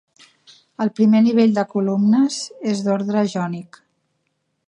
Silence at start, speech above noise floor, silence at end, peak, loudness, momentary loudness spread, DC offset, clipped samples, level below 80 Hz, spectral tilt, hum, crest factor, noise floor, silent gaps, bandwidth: 0.8 s; 54 dB; 1.05 s; -4 dBFS; -18 LUFS; 11 LU; under 0.1%; under 0.1%; -72 dBFS; -6.5 dB/octave; none; 14 dB; -71 dBFS; none; 10 kHz